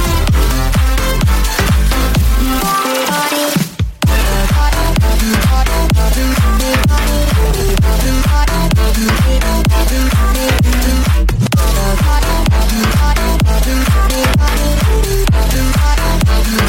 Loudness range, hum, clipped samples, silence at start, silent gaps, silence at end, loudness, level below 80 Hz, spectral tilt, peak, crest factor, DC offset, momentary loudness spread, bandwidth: 1 LU; none; under 0.1%; 0 s; none; 0 s; -13 LUFS; -12 dBFS; -5 dB/octave; 0 dBFS; 10 dB; under 0.1%; 1 LU; 16.5 kHz